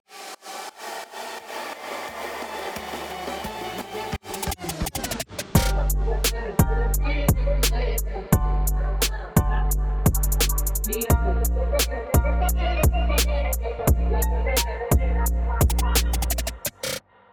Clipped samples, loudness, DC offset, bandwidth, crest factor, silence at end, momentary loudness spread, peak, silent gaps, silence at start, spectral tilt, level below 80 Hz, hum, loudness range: under 0.1%; -25 LUFS; under 0.1%; over 20 kHz; 18 dB; 0.35 s; 11 LU; -4 dBFS; none; 0.1 s; -4.5 dB/octave; -26 dBFS; none; 9 LU